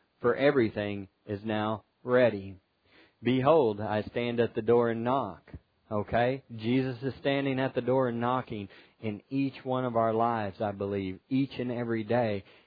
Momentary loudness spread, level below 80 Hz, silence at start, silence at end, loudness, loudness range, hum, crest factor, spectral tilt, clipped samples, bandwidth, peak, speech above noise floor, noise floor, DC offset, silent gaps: 13 LU; -62 dBFS; 0.2 s; 0.25 s; -29 LUFS; 3 LU; none; 20 dB; -10 dB/octave; under 0.1%; 5 kHz; -10 dBFS; 34 dB; -62 dBFS; under 0.1%; none